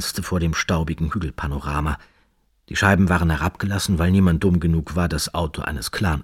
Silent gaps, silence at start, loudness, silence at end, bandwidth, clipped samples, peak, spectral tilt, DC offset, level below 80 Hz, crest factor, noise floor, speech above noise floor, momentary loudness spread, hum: none; 0 s; -21 LUFS; 0 s; 16 kHz; under 0.1%; -2 dBFS; -5.5 dB/octave; under 0.1%; -32 dBFS; 18 dB; -62 dBFS; 42 dB; 9 LU; none